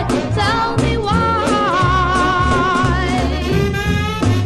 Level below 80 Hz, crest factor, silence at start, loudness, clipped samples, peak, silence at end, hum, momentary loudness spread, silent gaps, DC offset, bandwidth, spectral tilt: -26 dBFS; 12 dB; 0 s; -16 LUFS; under 0.1%; -4 dBFS; 0 s; none; 3 LU; none; under 0.1%; 14 kHz; -6 dB/octave